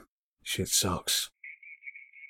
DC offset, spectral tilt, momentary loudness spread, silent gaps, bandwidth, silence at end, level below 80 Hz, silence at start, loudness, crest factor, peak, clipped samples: under 0.1%; -2 dB/octave; 19 LU; 0.08-0.37 s; 18 kHz; 0.05 s; -58 dBFS; 0 s; -28 LUFS; 22 dB; -12 dBFS; under 0.1%